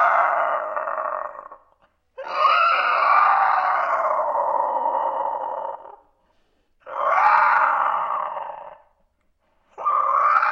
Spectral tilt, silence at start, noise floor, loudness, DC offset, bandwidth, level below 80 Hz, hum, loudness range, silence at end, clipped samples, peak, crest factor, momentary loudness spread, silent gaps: -2.5 dB/octave; 0 s; -66 dBFS; -20 LUFS; under 0.1%; 7.2 kHz; -70 dBFS; none; 5 LU; 0 s; under 0.1%; -4 dBFS; 18 dB; 16 LU; none